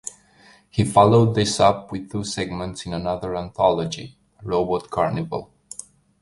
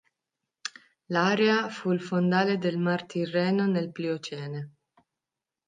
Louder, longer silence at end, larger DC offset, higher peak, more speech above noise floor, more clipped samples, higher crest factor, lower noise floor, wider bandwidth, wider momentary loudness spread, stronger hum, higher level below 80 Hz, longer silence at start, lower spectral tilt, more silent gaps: first, -21 LUFS vs -27 LUFS; second, 0.75 s vs 1 s; neither; first, -2 dBFS vs -10 dBFS; second, 32 dB vs 63 dB; neither; about the same, 20 dB vs 18 dB; second, -53 dBFS vs -89 dBFS; first, 11.5 kHz vs 9.2 kHz; first, 21 LU vs 16 LU; neither; first, -48 dBFS vs -76 dBFS; second, 0.05 s vs 0.65 s; about the same, -5.5 dB/octave vs -6 dB/octave; neither